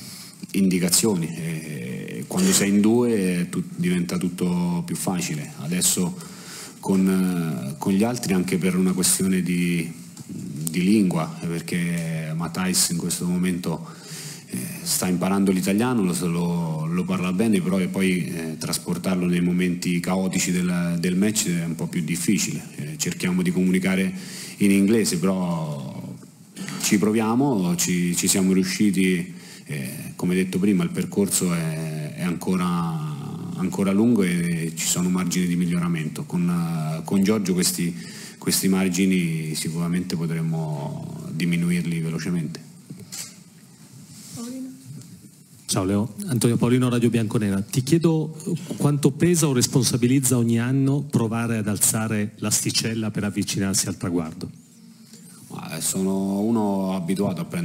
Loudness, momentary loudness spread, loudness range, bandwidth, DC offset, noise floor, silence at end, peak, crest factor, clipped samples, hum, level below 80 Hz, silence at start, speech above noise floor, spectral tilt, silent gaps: -23 LUFS; 14 LU; 5 LU; 16 kHz; under 0.1%; -48 dBFS; 0 s; -4 dBFS; 20 dB; under 0.1%; none; -60 dBFS; 0 s; 26 dB; -5 dB/octave; none